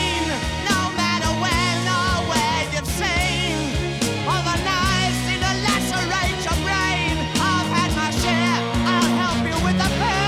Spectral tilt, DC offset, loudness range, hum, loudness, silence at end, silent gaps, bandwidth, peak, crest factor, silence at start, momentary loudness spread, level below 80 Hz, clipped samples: -4 dB/octave; under 0.1%; 1 LU; none; -20 LUFS; 0 s; none; 17 kHz; -6 dBFS; 16 dB; 0 s; 3 LU; -32 dBFS; under 0.1%